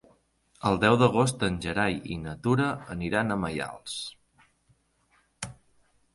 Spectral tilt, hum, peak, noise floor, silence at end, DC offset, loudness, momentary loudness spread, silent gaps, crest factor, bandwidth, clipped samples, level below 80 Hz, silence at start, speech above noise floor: -5.5 dB/octave; none; -8 dBFS; -68 dBFS; 0.6 s; under 0.1%; -27 LUFS; 18 LU; none; 22 dB; 11.5 kHz; under 0.1%; -52 dBFS; 0.65 s; 41 dB